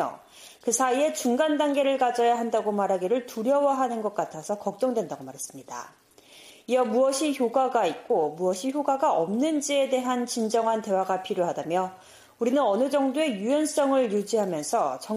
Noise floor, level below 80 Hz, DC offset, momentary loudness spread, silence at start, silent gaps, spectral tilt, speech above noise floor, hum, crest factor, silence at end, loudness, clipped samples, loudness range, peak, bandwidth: -52 dBFS; -74 dBFS; under 0.1%; 8 LU; 0 s; none; -4 dB/octave; 26 dB; none; 14 dB; 0 s; -25 LUFS; under 0.1%; 4 LU; -10 dBFS; 15.5 kHz